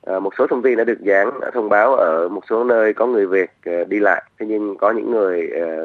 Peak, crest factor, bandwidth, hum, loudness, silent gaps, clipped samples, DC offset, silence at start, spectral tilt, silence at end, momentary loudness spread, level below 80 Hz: 0 dBFS; 16 dB; 6.6 kHz; none; -18 LUFS; none; under 0.1%; under 0.1%; 0.05 s; -7.5 dB/octave; 0 s; 8 LU; -72 dBFS